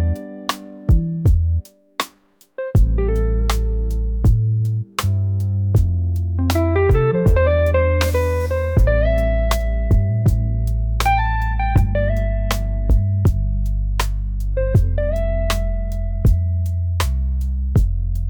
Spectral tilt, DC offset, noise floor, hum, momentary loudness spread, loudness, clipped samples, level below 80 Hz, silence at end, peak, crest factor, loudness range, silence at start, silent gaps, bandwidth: -6.5 dB/octave; under 0.1%; -54 dBFS; none; 8 LU; -19 LUFS; under 0.1%; -20 dBFS; 0 s; -6 dBFS; 12 dB; 4 LU; 0 s; none; 19.5 kHz